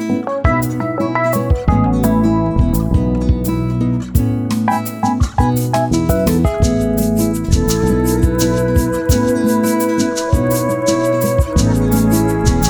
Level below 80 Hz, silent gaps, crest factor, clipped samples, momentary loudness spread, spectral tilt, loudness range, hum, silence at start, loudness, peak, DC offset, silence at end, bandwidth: -22 dBFS; none; 14 dB; under 0.1%; 3 LU; -6.5 dB/octave; 1 LU; none; 0 s; -15 LUFS; 0 dBFS; under 0.1%; 0 s; over 20 kHz